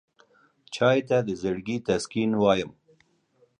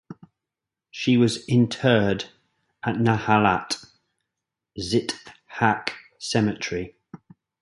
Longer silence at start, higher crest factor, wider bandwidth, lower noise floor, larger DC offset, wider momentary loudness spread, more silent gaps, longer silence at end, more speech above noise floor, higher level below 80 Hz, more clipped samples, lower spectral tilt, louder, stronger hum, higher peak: first, 0.7 s vs 0.1 s; about the same, 18 dB vs 22 dB; about the same, 11 kHz vs 11.5 kHz; second, -65 dBFS vs -87 dBFS; neither; second, 8 LU vs 16 LU; neither; first, 0.9 s vs 0.45 s; second, 41 dB vs 65 dB; about the same, -58 dBFS vs -54 dBFS; neither; about the same, -5.5 dB/octave vs -5.5 dB/octave; about the same, -25 LUFS vs -23 LUFS; neither; second, -8 dBFS vs -2 dBFS